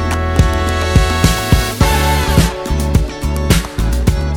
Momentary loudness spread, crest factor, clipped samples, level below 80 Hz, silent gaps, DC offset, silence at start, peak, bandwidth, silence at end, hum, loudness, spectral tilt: 4 LU; 14 dB; under 0.1%; -16 dBFS; none; under 0.1%; 0 s; 0 dBFS; 18.5 kHz; 0 s; none; -14 LUFS; -5 dB/octave